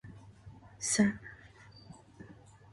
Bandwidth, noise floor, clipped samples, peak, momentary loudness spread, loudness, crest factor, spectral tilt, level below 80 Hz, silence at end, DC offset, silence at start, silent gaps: 11.5 kHz; -56 dBFS; under 0.1%; -14 dBFS; 26 LU; -31 LUFS; 22 dB; -3.5 dB/octave; -64 dBFS; 0.4 s; under 0.1%; 0.05 s; none